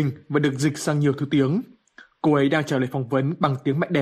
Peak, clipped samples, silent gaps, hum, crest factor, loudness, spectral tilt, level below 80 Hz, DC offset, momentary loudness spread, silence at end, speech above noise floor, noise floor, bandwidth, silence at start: -6 dBFS; under 0.1%; none; none; 16 dB; -23 LUFS; -6.5 dB/octave; -60 dBFS; under 0.1%; 4 LU; 0 s; 30 dB; -52 dBFS; 14.5 kHz; 0 s